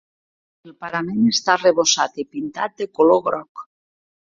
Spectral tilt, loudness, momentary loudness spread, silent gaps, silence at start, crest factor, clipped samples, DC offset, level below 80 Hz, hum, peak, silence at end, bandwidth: -3 dB/octave; -19 LUFS; 13 LU; 3.49-3.55 s; 0.65 s; 18 dB; under 0.1%; under 0.1%; -64 dBFS; none; -2 dBFS; 0.7 s; 7.8 kHz